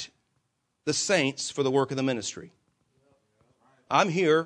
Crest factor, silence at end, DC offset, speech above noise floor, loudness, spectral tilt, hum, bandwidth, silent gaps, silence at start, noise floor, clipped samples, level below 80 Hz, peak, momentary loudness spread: 22 dB; 0 s; under 0.1%; 50 dB; -26 LUFS; -4 dB/octave; none; 10.5 kHz; none; 0 s; -76 dBFS; under 0.1%; -74 dBFS; -8 dBFS; 13 LU